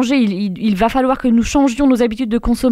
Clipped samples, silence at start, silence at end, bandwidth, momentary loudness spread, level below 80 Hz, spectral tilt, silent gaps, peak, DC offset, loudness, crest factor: under 0.1%; 0 s; 0 s; 14 kHz; 4 LU; -32 dBFS; -5.5 dB/octave; none; -2 dBFS; under 0.1%; -15 LUFS; 12 dB